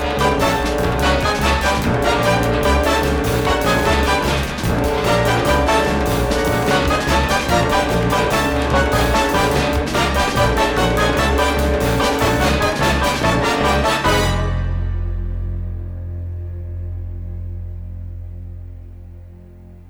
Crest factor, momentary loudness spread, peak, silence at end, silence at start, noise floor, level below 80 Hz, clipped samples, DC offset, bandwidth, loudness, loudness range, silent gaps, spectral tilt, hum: 14 dB; 13 LU; -2 dBFS; 0 s; 0 s; -39 dBFS; -26 dBFS; under 0.1%; under 0.1%; over 20 kHz; -17 LUFS; 12 LU; none; -5 dB/octave; none